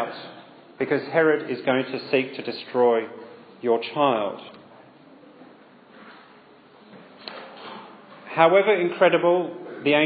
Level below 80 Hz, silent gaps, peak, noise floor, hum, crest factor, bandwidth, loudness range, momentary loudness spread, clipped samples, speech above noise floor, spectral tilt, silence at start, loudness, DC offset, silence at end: -78 dBFS; none; -2 dBFS; -51 dBFS; none; 22 dB; 5 kHz; 21 LU; 22 LU; under 0.1%; 30 dB; -9 dB/octave; 0 s; -22 LUFS; under 0.1%; 0 s